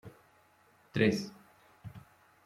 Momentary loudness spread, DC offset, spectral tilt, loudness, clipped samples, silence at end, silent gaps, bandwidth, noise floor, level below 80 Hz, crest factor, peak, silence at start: 25 LU; under 0.1%; -6 dB/octave; -32 LUFS; under 0.1%; 0.45 s; none; 15 kHz; -66 dBFS; -70 dBFS; 24 dB; -14 dBFS; 0.05 s